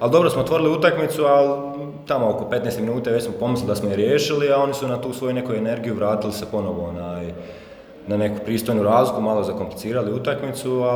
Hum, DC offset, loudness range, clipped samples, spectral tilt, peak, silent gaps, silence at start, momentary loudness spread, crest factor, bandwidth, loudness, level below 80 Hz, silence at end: none; under 0.1%; 5 LU; under 0.1%; -6 dB/octave; -4 dBFS; none; 0 s; 11 LU; 18 dB; over 20 kHz; -21 LUFS; -52 dBFS; 0 s